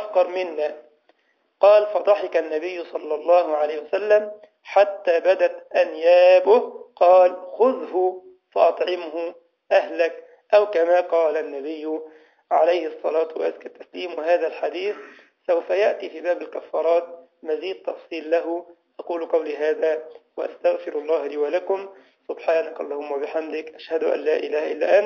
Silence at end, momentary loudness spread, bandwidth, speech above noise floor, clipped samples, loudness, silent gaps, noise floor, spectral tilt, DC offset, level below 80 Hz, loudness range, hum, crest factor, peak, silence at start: 0 s; 15 LU; 6.6 kHz; 45 dB; under 0.1%; -21 LUFS; none; -66 dBFS; -4 dB/octave; under 0.1%; -80 dBFS; 8 LU; none; 18 dB; -4 dBFS; 0 s